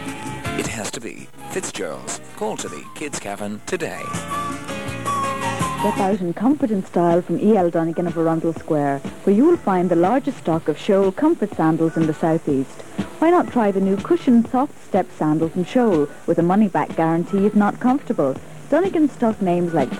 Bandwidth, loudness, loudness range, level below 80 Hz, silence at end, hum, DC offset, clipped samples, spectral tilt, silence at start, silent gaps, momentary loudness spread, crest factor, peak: 15.5 kHz; -20 LUFS; 9 LU; -52 dBFS; 0 s; none; 1%; under 0.1%; -6.5 dB/octave; 0 s; none; 12 LU; 14 dB; -6 dBFS